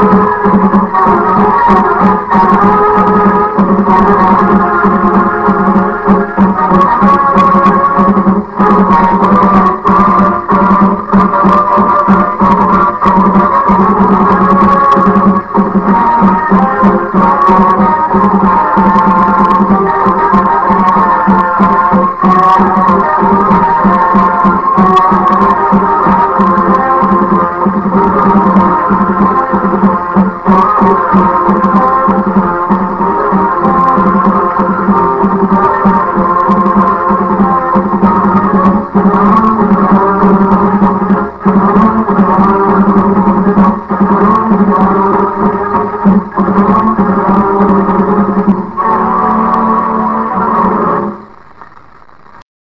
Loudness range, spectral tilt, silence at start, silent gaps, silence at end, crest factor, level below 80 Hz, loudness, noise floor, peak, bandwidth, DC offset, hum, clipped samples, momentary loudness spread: 2 LU; -9.5 dB/octave; 0 s; none; 1.15 s; 8 dB; -32 dBFS; -8 LUFS; -39 dBFS; 0 dBFS; 5.8 kHz; under 0.1%; none; 1%; 4 LU